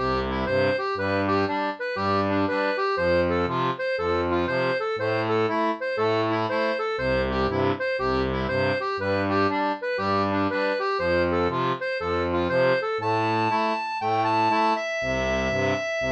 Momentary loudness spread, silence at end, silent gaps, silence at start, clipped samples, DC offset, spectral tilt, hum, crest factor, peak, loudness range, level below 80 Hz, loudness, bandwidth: 3 LU; 0 s; none; 0 s; under 0.1%; under 0.1%; -6 dB/octave; none; 14 dB; -10 dBFS; 1 LU; -44 dBFS; -24 LUFS; 8.4 kHz